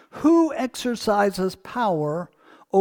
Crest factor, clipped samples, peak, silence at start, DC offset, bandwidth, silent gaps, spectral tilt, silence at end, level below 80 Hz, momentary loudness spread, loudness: 16 dB; under 0.1%; -6 dBFS; 0.15 s; under 0.1%; 18.5 kHz; none; -5.5 dB/octave; 0 s; -58 dBFS; 9 LU; -23 LUFS